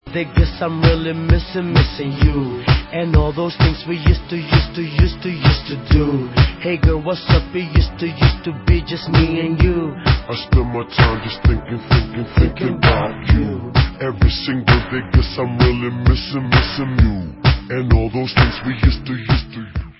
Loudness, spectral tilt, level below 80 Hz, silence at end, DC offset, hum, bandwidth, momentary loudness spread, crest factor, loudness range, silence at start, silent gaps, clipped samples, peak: -17 LUFS; -10.5 dB/octave; -20 dBFS; 0.1 s; under 0.1%; none; 5.8 kHz; 4 LU; 16 dB; 1 LU; 0.05 s; none; under 0.1%; 0 dBFS